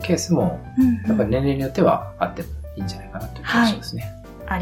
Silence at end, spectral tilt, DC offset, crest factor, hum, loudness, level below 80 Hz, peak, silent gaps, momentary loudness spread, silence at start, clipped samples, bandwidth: 0 s; -6 dB/octave; under 0.1%; 18 dB; none; -21 LUFS; -38 dBFS; -4 dBFS; none; 14 LU; 0 s; under 0.1%; 17 kHz